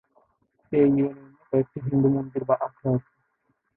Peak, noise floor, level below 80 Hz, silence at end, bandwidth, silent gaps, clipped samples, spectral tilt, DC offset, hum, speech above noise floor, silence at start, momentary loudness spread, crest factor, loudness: -8 dBFS; -73 dBFS; -60 dBFS; 0.75 s; 3.4 kHz; none; under 0.1%; -14 dB/octave; under 0.1%; none; 50 dB; 0.7 s; 7 LU; 16 dB; -25 LUFS